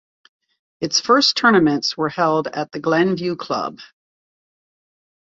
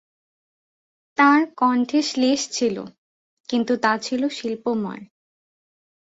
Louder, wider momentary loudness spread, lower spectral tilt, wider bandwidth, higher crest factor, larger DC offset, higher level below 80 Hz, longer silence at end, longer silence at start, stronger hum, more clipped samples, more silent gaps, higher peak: first, -18 LUFS vs -21 LUFS; second, 11 LU vs 16 LU; about the same, -4 dB/octave vs -3.5 dB/octave; about the same, 7.8 kHz vs 8 kHz; about the same, 20 dB vs 20 dB; neither; first, -62 dBFS vs -68 dBFS; first, 1.4 s vs 1.05 s; second, 0.8 s vs 1.2 s; neither; neither; second, none vs 2.98-3.44 s; about the same, -2 dBFS vs -4 dBFS